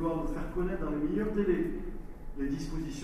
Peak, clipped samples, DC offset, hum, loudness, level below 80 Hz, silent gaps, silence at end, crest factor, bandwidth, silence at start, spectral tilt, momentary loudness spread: -16 dBFS; under 0.1%; under 0.1%; none; -33 LUFS; -40 dBFS; none; 0 s; 16 dB; 13 kHz; 0 s; -7.5 dB/octave; 13 LU